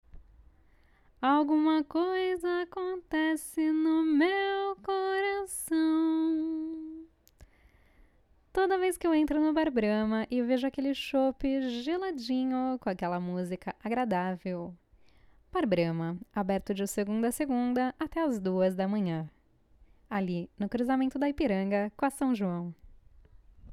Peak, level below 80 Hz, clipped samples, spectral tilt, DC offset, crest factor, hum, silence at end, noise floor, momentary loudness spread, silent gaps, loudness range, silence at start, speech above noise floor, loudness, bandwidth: -16 dBFS; -58 dBFS; under 0.1%; -6 dB/octave; under 0.1%; 16 dB; none; 0 s; -64 dBFS; 8 LU; none; 4 LU; 0.15 s; 35 dB; -30 LUFS; 14 kHz